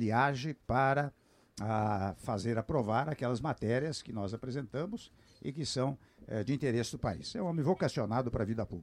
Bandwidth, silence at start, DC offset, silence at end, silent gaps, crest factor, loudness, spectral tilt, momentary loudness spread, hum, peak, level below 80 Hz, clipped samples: 13 kHz; 0 s; under 0.1%; 0 s; none; 18 dB; -34 LUFS; -6 dB/octave; 10 LU; none; -16 dBFS; -56 dBFS; under 0.1%